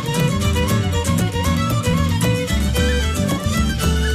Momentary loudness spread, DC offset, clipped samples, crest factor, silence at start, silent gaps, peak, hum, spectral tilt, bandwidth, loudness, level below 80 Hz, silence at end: 1 LU; under 0.1%; under 0.1%; 12 dB; 0 s; none; -6 dBFS; none; -5 dB/octave; 15.5 kHz; -19 LUFS; -24 dBFS; 0 s